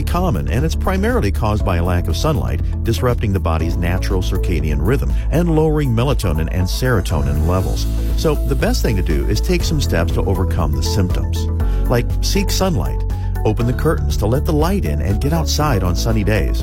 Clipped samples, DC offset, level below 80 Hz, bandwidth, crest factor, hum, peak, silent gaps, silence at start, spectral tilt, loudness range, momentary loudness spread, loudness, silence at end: under 0.1%; under 0.1%; -20 dBFS; 16.5 kHz; 12 dB; none; -4 dBFS; none; 0 s; -6 dB/octave; 1 LU; 3 LU; -18 LUFS; 0 s